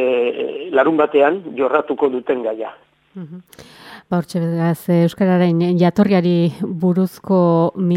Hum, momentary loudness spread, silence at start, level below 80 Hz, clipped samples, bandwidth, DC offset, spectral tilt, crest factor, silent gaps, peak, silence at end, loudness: none; 10 LU; 0 s; -62 dBFS; under 0.1%; 14.5 kHz; under 0.1%; -8.5 dB/octave; 16 dB; none; 0 dBFS; 0 s; -17 LUFS